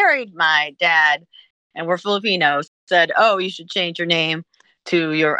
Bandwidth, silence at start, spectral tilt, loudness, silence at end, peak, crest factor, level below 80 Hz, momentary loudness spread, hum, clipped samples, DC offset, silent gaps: 9.6 kHz; 0 s; -4 dB/octave; -18 LUFS; 0 s; -2 dBFS; 16 dB; -76 dBFS; 9 LU; none; under 0.1%; under 0.1%; 1.50-1.70 s, 2.68-2.87 s